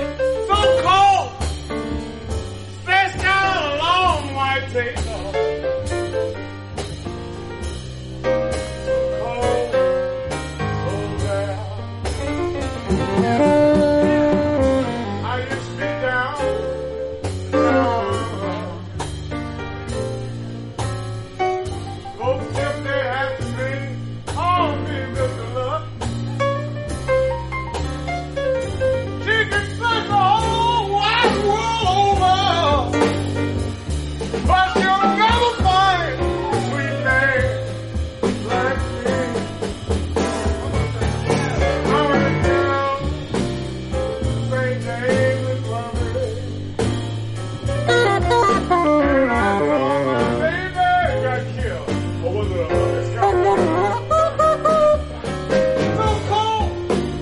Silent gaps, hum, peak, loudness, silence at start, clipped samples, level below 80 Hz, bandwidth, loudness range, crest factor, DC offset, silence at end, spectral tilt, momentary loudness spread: none; none; -2 dBFS; -20 LUFS; 0 s; under 0.1%; -32 dBFS; 11.5 kHz; 7 LU; 18 dB; under 0.1%; 0 s; -5.5 dB/octave; 11 LU